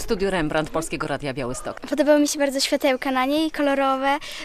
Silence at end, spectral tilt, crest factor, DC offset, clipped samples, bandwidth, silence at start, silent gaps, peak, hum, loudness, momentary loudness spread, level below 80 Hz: 0 s; -4 dB/octave; 18 dB; under 0.1%; under 0.1%; 15 kHz; 0 s; none; -4 dBFS; none; -22 LUFS; 10 LU; -42 dBFS